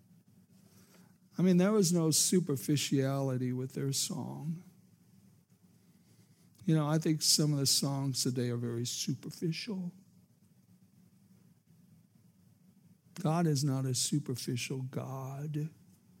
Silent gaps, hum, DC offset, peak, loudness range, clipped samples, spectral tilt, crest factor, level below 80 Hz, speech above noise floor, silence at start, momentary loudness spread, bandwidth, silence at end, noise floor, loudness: none; none; under 0.1%; -14 dBFS; 10 LU; under 0.1%; -4.5 dB/octave; 20 dB; -84 dBFS; 33 dB; 1.4 s; 13 LU; 16.5 kHz; 0.5 s; -65 dBFS; -32 LUFS